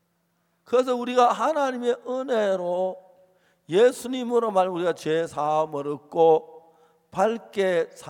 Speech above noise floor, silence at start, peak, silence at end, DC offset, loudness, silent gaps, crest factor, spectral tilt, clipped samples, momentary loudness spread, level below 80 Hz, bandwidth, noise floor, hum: 48 dB; 0.7 s; -6 dBFS; 0 s; under 0.1%; -24 LUFS; none; 18 dB; -5 dB/octave; under 0.1%; 9 LU; -74 dBFS; 16 kHz; -71 dBFS; none